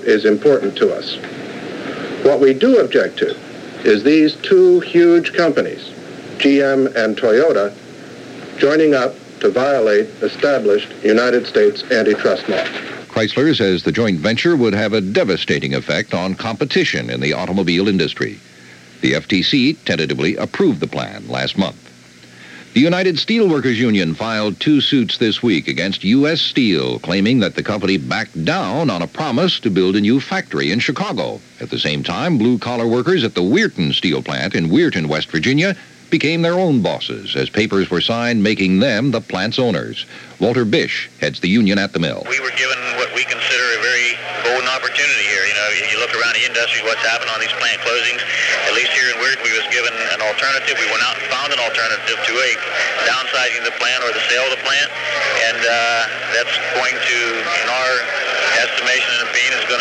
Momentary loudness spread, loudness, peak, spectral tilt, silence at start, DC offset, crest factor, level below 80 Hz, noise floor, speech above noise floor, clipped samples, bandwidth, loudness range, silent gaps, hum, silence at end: 7 LU; -16 LUFS; 0 dBFS; -4.5 dB/octave; 0 s; under 0.1%; 16 dB; -56 dBFS; -42 dBFS; 26 dB; under 0.1%; 11 kHz; 3 LU; none; none; 0 s